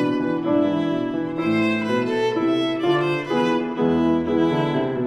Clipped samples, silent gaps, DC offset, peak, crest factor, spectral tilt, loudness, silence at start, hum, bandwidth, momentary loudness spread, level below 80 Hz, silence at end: under 0.1%; none; under 0.1%; -8 dBFS; 14 dB; -7 dB/octave; -21 LUFS; 0 s; none; 9.4 kHz; 3 LU; -54 dBFS; 0 s